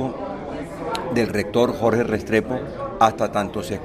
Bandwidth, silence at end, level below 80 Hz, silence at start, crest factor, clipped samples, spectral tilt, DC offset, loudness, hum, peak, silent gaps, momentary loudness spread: 15.5 kHz; 0 s; -46 dBFS; 0 s; 22 dB; under 0.1%; -6 dB/octave; under 0.1%; -22 LUFS; none; 0 dBFS; none; 11 LU